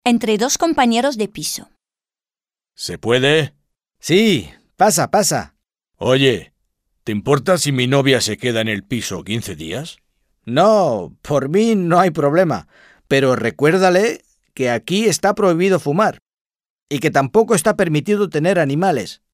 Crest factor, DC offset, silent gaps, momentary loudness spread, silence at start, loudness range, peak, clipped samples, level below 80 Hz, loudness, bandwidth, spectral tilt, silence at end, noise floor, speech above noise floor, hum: 16 dB; under 0.1%; 16.22-16.26 s, 16.41-16.45 s, 16.70-16.87 s; 11 LU; 0.05 s; 3 LU; -2 dBFS; under 0.1%; -52 dBFS; -17 LUFS; 16 kHz; -4.5 dB/octave; 0.2 s; under -90 dBFS; over 74 dB; none